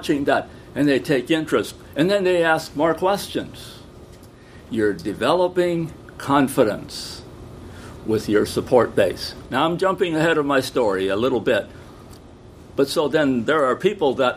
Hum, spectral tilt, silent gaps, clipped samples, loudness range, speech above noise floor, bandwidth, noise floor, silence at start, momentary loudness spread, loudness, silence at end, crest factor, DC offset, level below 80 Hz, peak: none; -5.5 dB/octave; none; under 0.1%; 3 LU; 24 dB; 15.5 kHz; -44 dBFS; 0 s; 14 LU; -21 LUFS; 0 s; 18 dB; under 0.1%; -48 dBFS; -2 dBFS